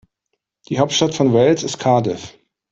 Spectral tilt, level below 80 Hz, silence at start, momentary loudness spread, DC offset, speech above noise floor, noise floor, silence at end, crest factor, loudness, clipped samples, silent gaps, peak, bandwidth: -5 dB/octave; -56 dBFS; 0.7 s; 11 LU; under 0.1%; 59 dB; -75 dBFS; 0.4 s; 16 dB; -17 LUFS; under 0.1%; none; -2 dBFS; 8.2 kHz